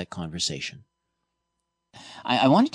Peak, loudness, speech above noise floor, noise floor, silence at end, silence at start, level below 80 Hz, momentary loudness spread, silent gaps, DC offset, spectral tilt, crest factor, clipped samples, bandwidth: -8 dBFS; -25 LUFS; 56 dB; -80 dBFS; 0.05 s; 0 s; -62 dBFS; 17 LU; none; under 0.1%; -4.5 dB/octave; 18 dB; under 0.1%; 10 kHz